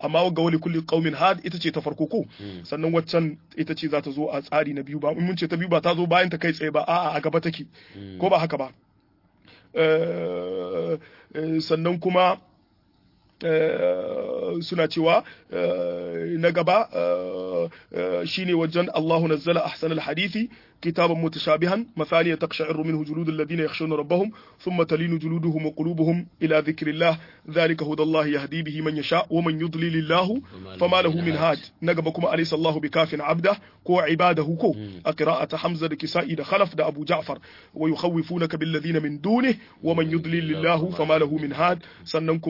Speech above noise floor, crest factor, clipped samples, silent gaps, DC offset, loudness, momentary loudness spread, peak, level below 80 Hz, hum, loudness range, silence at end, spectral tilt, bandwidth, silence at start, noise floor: 39 dB; 18 dB; under 0.1%; none; under 0.1%; -24 LUFS; 8 LU; -6 dBFS; -66 dBFS; none; 3 LU; 0 s; -7.5 dB/octave; 5.8 kHz; 0 s; -62 dBFS